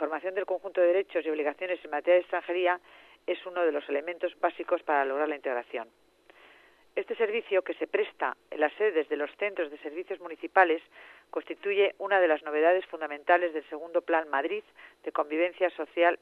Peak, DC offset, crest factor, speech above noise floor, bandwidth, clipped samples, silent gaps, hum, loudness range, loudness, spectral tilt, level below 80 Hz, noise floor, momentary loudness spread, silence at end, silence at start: -6 dBFS; under 0.1%; 22 dB; 30 dB; 4.4 kHz; under 0.1%; none; none; 5 LU; -29 LUFS; -5 dB/octave; -80 dBFS; -59 dBFS; 12 LU; 0.05 s; 0 s